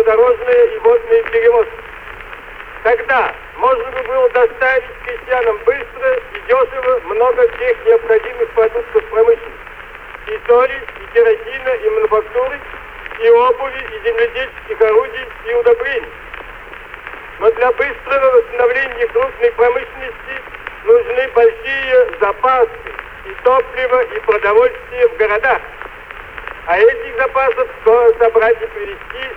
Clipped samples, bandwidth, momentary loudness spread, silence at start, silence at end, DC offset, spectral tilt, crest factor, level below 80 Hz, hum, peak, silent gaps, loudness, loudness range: under 0.1%; 4.3 kHz; 18 LU; 0 s; 0 s; under 0.1%; -5 dB/octave; 14 dB; -42 dBFS; none; -2 dBFS; none; -14 LUFS; 2 LU